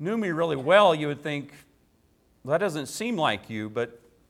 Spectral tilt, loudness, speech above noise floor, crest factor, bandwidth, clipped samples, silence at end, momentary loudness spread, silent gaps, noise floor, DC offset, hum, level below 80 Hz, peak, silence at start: -5 dB/octave; -25 LUFS; 39 dB; 22 dB; 15.5 kHz; under 0.1%; 0.35 s; 15 LU; none; -64 dBFS; under 0.1%; none; -66 dBFS; -6 dBFS; 0 s